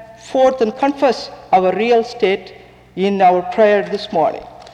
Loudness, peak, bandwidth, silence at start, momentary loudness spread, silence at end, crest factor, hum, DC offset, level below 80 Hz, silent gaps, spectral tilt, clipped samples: -16 LUFS; -4 dBFS; 9.8 kHz; 0 s; 9 LU; 0.05 s; 12 dB; none; under 0.1%; -54 dBFS; none; -6 dB/octave; under 0.1%